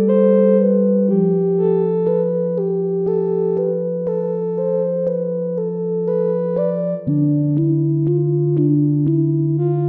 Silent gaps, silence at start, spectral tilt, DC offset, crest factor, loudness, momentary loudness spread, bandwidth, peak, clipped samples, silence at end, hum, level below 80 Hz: none; 0 s; -14 dB/octave; under 0.1%; 12 dB; -18 LUFS; 7 LU; 3.3 kHz; -4 dBFS; under 0.1%; 0 s; none; -60 dBFS